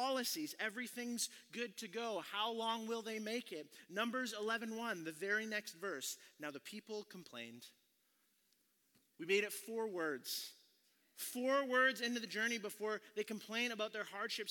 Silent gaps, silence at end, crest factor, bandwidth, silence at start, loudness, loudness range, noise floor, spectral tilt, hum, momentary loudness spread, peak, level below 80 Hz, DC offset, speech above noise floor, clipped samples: none; 0 s; 20 dB; 18 kHz; 0 s; -41 LUFS; 7 LU; -79 dBFS; -2 dB/octave; none; 12 LU; -22 dBFS; under -90 dBFS; under 0.1%; 37 dB; under 0.1%